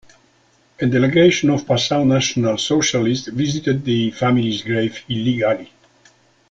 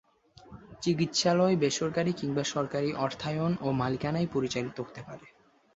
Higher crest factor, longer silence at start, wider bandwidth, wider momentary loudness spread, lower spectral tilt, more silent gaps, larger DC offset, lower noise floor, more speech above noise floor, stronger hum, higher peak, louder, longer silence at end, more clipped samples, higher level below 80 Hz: about the same, 16 dB vs 18 dB; first, 0.8 s vs 0.45 s; about the same, 8.4 kHz vs 8 kHz; second, 8 LU vs 13 LU; about the same, -5 dB/octave vs -5 dB/octave; neither; neither; about the same, -57 dBFS vs -56 dBFS; first, 40 dB vs 26 dB; neither; first, -2 dBFS vs -12 dBFS; first, -18 LUFS vs -29 LUFS; first, 0.85 s vs 0.5 s; neither; first, -52 dBFS vs -62 dBFS